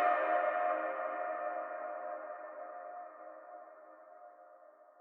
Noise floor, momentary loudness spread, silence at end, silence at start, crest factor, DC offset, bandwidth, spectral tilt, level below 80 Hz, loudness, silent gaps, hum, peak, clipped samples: -60 dBFS; 24 LU; 0 s; 0 s; 20 dB; under 0.1%; 4.2 kHz; 1.5 dB/octave; under -90 dBFS; -37 LUFS; none; none; -20 dBFS; under 0.1%